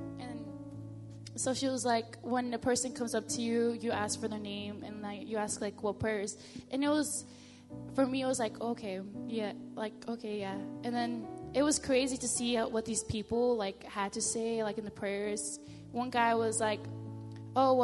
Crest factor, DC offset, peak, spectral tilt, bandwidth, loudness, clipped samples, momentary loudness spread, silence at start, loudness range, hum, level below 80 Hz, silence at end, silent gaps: 20 dB; under 0.1%; -14 dBFS; -3.5 dB/octave; 11.5 kHz; -34 LUFS; under 0.1%; 13 LU; 0 s; 4 LU; none; -62 dBFS; 0 s; none